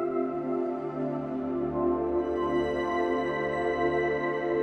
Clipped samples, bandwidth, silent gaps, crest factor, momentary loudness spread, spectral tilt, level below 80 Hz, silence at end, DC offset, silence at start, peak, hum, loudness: under 0.1%; 6.4 kHz; none; 12 dB; 5 LU; -7.5 dB/octave; -52 dBFS; 0 s; under 0.1%; 0 s; -16 dBFS; none; -29 LUFS